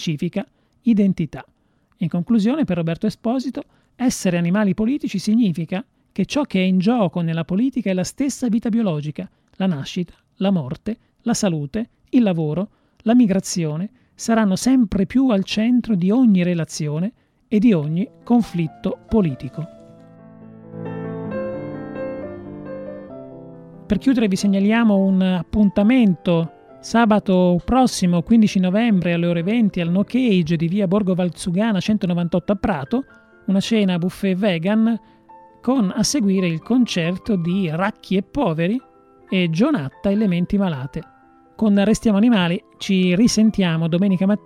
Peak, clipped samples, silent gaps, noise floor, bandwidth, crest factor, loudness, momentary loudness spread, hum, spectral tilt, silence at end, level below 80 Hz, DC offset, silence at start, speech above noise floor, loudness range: -4 dBFS; under 0.1%; none; -46 dBFS; 13.5 kHz; 14 dB; -19 LUFS; 13 LU; none; -6.5 dB/octave; 0.1 s; -46 dBFS; under 0.1%; 0 s; 28 dB; 6 LU